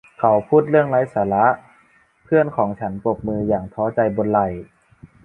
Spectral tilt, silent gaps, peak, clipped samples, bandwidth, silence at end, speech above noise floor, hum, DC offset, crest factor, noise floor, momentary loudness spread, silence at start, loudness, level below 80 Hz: -10 dB/octave; none; -2 dBFS; under 0.1%; 3.8 kHz; 0.6 s; 38 dB; none; under 0.1%; 18 dB; -56 dBFS; 8 LU; 0.2 s; -19 LUFS; -50 dBFS